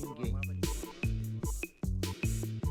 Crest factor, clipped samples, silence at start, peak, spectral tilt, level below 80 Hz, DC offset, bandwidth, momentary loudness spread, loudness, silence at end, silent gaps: 16 dB; under 0.1%; 0 s; -18 dBFS; -5.5 dB/octave; -40 dBFS; under 0.1%; 19.5 kHz; 3 LU; -36 LUFS; 0 s; none